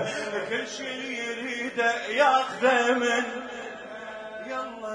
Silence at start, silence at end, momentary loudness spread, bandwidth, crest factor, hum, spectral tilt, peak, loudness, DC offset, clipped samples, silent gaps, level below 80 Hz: 0 s; 0 s; 16 LU; 10.5 kHz; 20 dB; none; -2.5 dB/octave; -8 dBFS; -26 LUFS; under 0.1%; under 0.1%; none; -70 dBFS